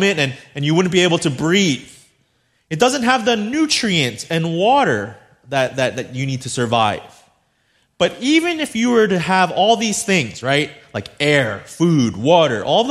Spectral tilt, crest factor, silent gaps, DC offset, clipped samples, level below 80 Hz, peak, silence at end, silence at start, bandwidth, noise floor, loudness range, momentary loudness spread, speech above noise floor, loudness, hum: -4.5 dB/octave; 16 dB; none; under 0.1%; under 0.1%; -56 dBFS; 0 dBFS; 0 s; 0 s; 14 kHz; -63 dBFS; 3 LU; 9 LU; 46 dB; -17 LUFS; none